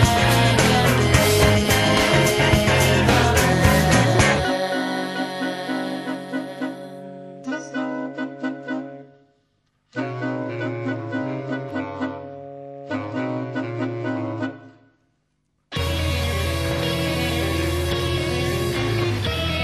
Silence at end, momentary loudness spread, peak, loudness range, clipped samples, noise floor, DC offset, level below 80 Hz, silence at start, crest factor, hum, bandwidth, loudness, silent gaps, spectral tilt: 0 s; 14 LU; 0 dBFS; 13 LU; under 0.1%; -70 dBFS; under 0.1%; -34 dBFS; 0 s; 20 dB; none; 13 kHz; -21 LUFS; none; -4.5 dB/octave